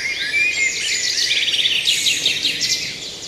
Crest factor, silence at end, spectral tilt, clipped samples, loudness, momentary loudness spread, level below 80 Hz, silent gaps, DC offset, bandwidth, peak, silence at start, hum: 16 dB; 0 s; 1.5 dB/octave; under 0.1%; -16 LUFS; 4 LU; -56 dBFS; none; under 0.1%; 14.5 kHz; -4 dBFS; 0 s; none